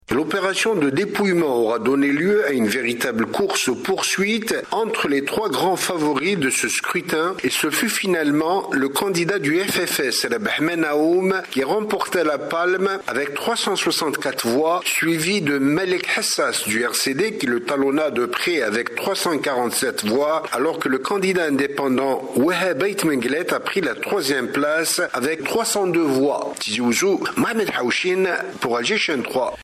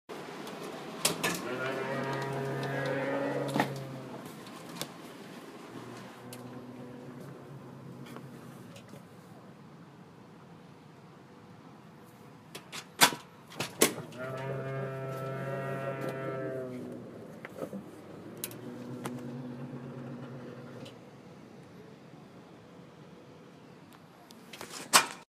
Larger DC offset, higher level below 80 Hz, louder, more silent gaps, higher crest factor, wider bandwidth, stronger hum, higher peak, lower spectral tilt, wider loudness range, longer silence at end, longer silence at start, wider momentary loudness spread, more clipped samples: neither; first, -60 dBFS vs -76 dBFS; first, -20 LUFS vs -34 LUFS; neither; second, 12 dB vs 34 dB; about the same, 15 kHz vs 15.5 kHz; neither; second, -8 dBFS vs -4 dBFS; about the same, -3.5 dB/octave vs -3 dB/octave; second, 1 LU vs 20 LU; about the same, 0 s vs 0.1 s; about the same, 0.1 s vs 0.1 s; second, 3 LU vs 23 LU; neither